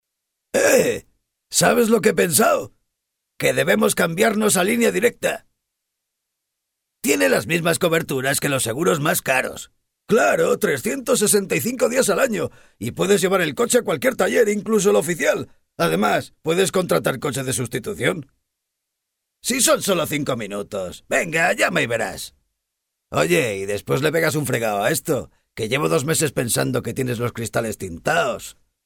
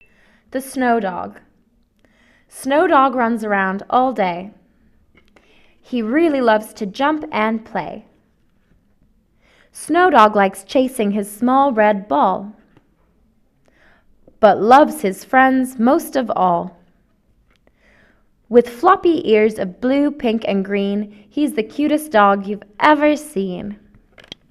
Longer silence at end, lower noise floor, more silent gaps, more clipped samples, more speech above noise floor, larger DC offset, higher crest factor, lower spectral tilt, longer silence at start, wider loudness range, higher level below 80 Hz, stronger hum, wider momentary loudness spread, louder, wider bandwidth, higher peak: second, 0.35 s vs 0.75 s; first, -80 dBFS vs -58 dBFS; neither; neither; first, 60 dB vs 42 dB; neither; about the same, 20 dB vs 18 dB; second, -3.5 dB/octave vs -5.5 dB/octave; about the same, 0.55 s vs 0.55 s; about the same, 4 LU vs 5 LU; about the same, -54 dBFS vs -56 dBFS; neither; second, 10 LU vs 14 LU; second, -20 LUFS vs -16 LUFS; first, 19.5 kHz vs 14 kHz; about the same, -2 dBFS vs 0 dBFS